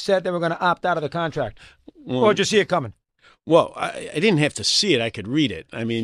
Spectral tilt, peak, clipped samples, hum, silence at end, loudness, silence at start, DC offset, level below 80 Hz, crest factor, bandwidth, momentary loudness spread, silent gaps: -4.5 dB/octave; -4 dBFS; under 0.1%; none; 0 s; -21 LUFS; 0 s; under 0.1%; -56 dBFS; 18 dB; 14 kHz; 11 LU; none